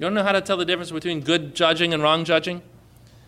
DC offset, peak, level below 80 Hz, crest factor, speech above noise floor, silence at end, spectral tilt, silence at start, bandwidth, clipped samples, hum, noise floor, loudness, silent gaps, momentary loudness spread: under 0.1%; -6 dBFS; -58 dBFS; 16 dB; 28 dB; 0.65 s; -4.5 dB/octave; 0 s; 13.5 kHz; under 0.1%; none; -50 dBFS; -21 LUFS; none; 8 LU